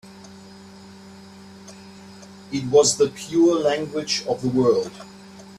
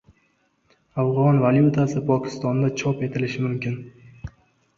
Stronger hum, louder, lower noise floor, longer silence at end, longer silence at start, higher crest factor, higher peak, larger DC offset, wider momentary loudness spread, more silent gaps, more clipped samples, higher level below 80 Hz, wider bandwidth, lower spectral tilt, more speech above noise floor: neither; about the same, -20 LUFS vs -22 LUFS; second, -43 dBFS vs -66 dBFS; second, 0 s vs 0.5 s; second, 0.05 s vs 0.95 s; about the same, 18 dB vs 18 dB; about the same, -4 dBFS vs -6 dBFS; neither; first, 26 LU vs 20 LU; neither; neither; second, -60 dBFS vs -54 dBFS; first, 13.5 kHz vs 7.4 kHz; second, -4 dB/octave vs -8 dB/octave; second, 23 dB vs 45 dB